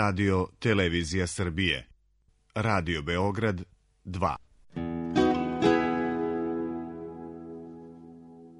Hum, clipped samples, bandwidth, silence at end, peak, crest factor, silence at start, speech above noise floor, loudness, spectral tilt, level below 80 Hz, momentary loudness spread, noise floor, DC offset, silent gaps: none; under 0.1%; 10.5 kHz; 0 s; -10 dBFS; 20 dB; 0 s; 39 dB; -28 LUFS; -5.5 dB/octave; -50 dBFS; 19 LU; -67 dBFS; under 0.1%; none